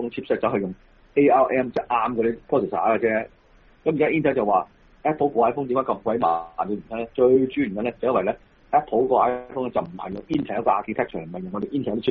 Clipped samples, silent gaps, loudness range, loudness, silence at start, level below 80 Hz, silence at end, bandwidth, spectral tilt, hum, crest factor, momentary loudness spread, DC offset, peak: under 0.1%; none; 2 LU; -23 LUFS; 0 s; -54 dBFS; 0 s; 5.6 kHz; -5.5 dB/octave; none; 16 dB; 10 LU; under 0.1%; -6 dBFS